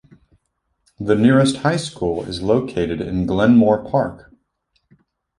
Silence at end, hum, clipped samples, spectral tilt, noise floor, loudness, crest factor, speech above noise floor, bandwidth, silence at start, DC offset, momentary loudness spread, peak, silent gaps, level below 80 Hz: 1.2 s; none; under 0.1%; -6.5 dB/octave; -71 dBFS; -18 LUFS; 16 dB; 54 dB; 11 kHz; 1 s; under 0.1%; 10 LU; -2 dBFS; none; -44 dBFS